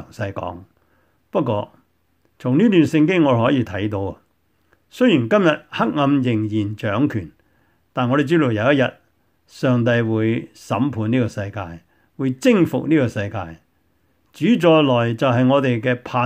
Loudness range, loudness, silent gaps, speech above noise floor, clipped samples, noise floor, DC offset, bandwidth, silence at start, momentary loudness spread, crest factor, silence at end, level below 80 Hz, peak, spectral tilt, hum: 3 LU; -19 LUFS; none; 46 dB; under 0.1%; -64 dBFS; under 0.1%; 15 kHz; 0 s; 13 LU; 18 dB; 0 s; -58 dBFS; -2 dBFS; -7.5 dB/octave; none